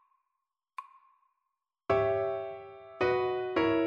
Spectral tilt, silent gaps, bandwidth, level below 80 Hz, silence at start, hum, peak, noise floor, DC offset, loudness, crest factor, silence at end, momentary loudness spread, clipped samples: -7.5 dB/octave; none; 6.8 kHz; -62 dBFS; 0.8 s; none; -16 dBFS; -86 dBFS; under 0.1%; -31 LUFS; 18 dB; 0 s; 19 LU; under 0.1%